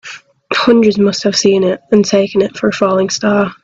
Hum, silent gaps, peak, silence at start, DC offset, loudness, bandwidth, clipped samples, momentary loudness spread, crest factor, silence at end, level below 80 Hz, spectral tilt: none; none; 0 dBFS; 0.05 s; under 0.1%; -12 LUFS; 7.8 kHz; under 0.1%; 5 LU; 12 dB; 0.1 s; -52 dBFS; -4.5 dB/octave